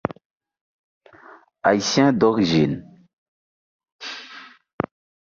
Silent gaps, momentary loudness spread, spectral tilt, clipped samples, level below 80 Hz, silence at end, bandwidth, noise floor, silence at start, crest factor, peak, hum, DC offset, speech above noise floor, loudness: 0.25-0.36 s, 0.61-1.01 s, 3.13-3.79 s, 3.92-3.99 s; 19 LU; -5 dB/octave; under 0.1%; -56 dBFS; 0.75 s; 7.4 kHz; -48 dBFS; 0.1 s; 20 dB; -4 dBFS; none; under 0.1%; 30 dB; -20 LUFS